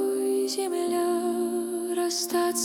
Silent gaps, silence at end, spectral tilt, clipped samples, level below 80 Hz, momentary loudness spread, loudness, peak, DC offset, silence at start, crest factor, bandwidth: none; 0 s; -2 dB/octave; under 0.1%; -76 dBFS; 3 LU; -27 LUFS; -14 dBFS; under 0.1%; 0 s; 12 dB; 18 kHz